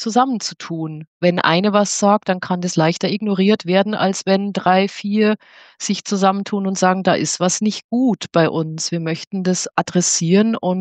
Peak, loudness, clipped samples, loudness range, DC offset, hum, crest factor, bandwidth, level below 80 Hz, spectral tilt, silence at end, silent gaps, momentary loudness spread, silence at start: 0 dBFS; -18 LUFS; under 0.1%; 2 LU; under 0.1%; none; 16 dB; 9.4 kHz; -68 dBFS; -4.5 dB/octave; 0 s; 1.07-1.20 s, 7.84-7.89 s, 9.27-9.31 s; 8 LU; 0 s